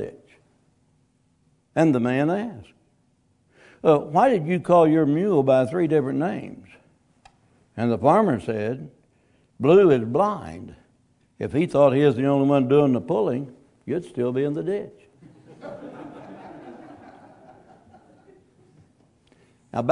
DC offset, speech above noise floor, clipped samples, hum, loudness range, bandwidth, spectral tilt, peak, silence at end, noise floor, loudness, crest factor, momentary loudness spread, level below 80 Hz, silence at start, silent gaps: under 0.1%; 44 dB; under 0.1%; none; 11 LU; 11 kHz; -8.5 dB/octave; -4 dBFS; 0 s; -65 dBFS; -21 LUFS; 20 dB; 23 LU; -62 dBFS; 0 s; none